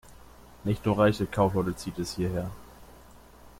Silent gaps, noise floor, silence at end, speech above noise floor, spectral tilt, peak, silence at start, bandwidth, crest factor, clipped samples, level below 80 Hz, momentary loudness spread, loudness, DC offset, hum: none; -52 dBFS; 0.1 s; 25 dB; -6.5 dB/octave; -10 dBFS; 0.05 s; 16.5 kHz; 18 dB; under 0.1%; -50 dBFS; 12 LU; -28 LUFS; under 0.1%; 60 Hz at -45 dBFS